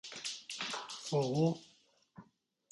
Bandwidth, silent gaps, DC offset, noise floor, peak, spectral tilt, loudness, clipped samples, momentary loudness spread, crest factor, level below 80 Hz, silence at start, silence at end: 11.5 kHz; none; under 0.1%; -69 dBFS; -20 dBFS; -5 dB/octave; -37 LUFS; under 0.1%; 9 LU; 18 dB; -78 dBFS; 0.05 s; 0.5 s